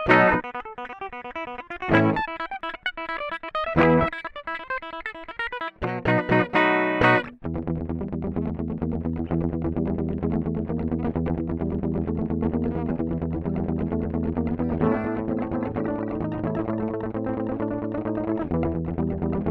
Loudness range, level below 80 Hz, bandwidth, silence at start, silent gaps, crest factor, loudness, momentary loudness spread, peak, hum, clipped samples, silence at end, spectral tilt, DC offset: 4 LU; -40 dBFS; 6.2 kHz; 0 s; none; 22 dB; -26 LUFS; 11 LU; -4 dBFS; none; under 0.1%; 0 s; -8.5 dB/octave; under 0.1%